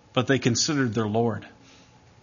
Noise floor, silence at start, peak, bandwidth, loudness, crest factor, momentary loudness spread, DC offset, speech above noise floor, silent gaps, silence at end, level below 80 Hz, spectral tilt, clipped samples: -54 dBFS; 0.15 s; -6 dBFS; 7.4 kHz; -24 LUFS; 20 dB; 5 LU; under 0.1%; 30 dB; none; 0.75 s; -62 dBFS; -4.5 dB/octave; under 0.1%